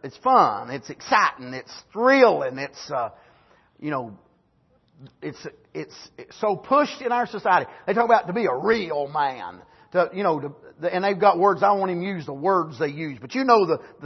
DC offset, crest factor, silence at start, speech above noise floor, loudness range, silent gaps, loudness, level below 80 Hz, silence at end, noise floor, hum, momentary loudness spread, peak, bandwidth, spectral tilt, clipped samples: under 0.1%; 20 dB; 0 s; 41 dB; 11 LU; none; -22 LUFS; -66 dBFS; 0 s; -63 dBFS; none; 18 LU; -4 dBFS; 6.2 kHz; -5.5 dB/octave; under 0.1%